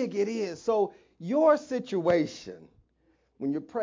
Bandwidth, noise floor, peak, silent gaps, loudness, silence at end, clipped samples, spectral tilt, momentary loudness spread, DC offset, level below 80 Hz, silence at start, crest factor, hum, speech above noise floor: 7.6 kHz; -69 dBFS; -10 dBFS; none; -28 LUFS; 0 s; under 0.1%; -6 dB/octave; 14 LU; under 0.1%; -68 dBFS; 0 s; 18 dB; none; 42 dB